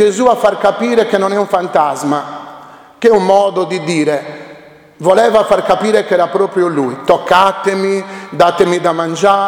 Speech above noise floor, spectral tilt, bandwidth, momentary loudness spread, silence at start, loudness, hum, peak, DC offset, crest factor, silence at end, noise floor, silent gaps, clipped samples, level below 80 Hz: 26 dB; -5 dB/octave; 17.5 kHz; 9 LU; 0 s; -12 LUFS; none; 0 dBFS; under 0.1%; 12 dB; 0 s; -38 dBFS; none; 0.2%; -50 dBFS